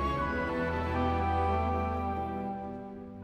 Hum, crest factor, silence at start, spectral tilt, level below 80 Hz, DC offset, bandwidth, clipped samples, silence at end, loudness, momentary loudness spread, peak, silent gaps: none; 14 dB; 0 s; -8 dB/octave; -42 dBFS; under 0.1%; 8.2 kHz; under 0.1%; 0 s; -32 LUFS; 10 LU; -18 dBFS; none